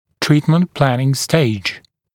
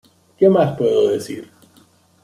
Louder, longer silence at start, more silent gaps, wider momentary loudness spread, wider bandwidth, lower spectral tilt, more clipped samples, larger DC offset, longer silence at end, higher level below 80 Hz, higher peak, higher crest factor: about the same, -16 LUFS vs -16 LUFS; second, 0.2 s vs 0.4 s; neither; second, 9 LU vs 16 LU; first, 17 kHz vs 13.5 kHz; second, -5.5 dB/octave vs -7 dB/octave; neither; neither; second, 0.35 s vs 0.8 s; first, -52 dBFS vs -60 dBFS; about the same, 0 dBFS vs -2 dBFS; about the same, 16 dB vs 16 dB